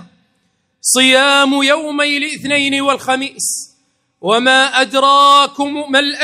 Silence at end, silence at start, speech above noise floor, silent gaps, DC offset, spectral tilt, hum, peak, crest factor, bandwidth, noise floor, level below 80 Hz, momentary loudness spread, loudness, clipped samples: 0 s; 0 s; 50 dB; none; under 0.1%; -1 dB/octave; none; 0 dBFS; 14 dB; 16 kHz; -63 dBFS; -64 dBFS; 10 LU; -12 LUFS; 0.1%